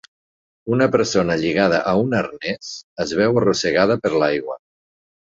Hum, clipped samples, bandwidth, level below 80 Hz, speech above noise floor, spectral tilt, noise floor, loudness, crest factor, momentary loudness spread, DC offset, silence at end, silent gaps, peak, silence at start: none; under 0.1%; 8 kHz; -52 dBFS; over 71 dB; -5 dB/octave; under -90 dBFS; -19 LUFS; 18 dB; 12 LU; under 0.1%; 0.85 s; 2.84-2.96 s; -2 dBFS; 0.65 s